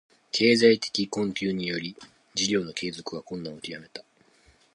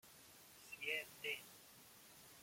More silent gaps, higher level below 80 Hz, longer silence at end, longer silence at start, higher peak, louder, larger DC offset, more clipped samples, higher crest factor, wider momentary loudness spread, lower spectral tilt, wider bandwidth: neither; first, -66 dBFS vs -86 dBFS; first, 0.75 s vs 0 s; first, 0.35 s vs 0.05 s; first, -6 dBFS vs -30 dBFS; first, -26 LUFS vs -46 LUFS; neither; neither; about the same, 22 dB vs 22 dB; about the same, 19 LU vs 17 LU; first, -4 dB/octave vs -1 dB/octave; second, 11 kHz vs 16.5 kHz